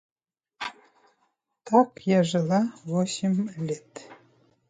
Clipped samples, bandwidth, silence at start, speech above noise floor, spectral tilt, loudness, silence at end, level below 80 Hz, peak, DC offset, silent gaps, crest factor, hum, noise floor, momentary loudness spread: under 0.1%; 9.4 kHz; 0.6 s; 49 dB; -6 dB/octave; -26 LUFS; 0.55 s; -72 dBFS; -6 dBFS; under 0.1%; none; 20 dB; none; -73 dBFS; 15 LU